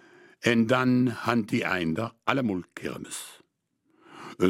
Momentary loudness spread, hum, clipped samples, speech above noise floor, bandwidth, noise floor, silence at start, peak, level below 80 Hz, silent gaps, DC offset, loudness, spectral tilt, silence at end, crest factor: 15 LU; none; under 0.1%; 47 dB; 16 kHz; -73 dBFS; 0.4 s; -4 dBFS; -64 dBFS; none; under 0.1%; -27 LUFS; -5.5 dB/octave; 0 s; 22 dB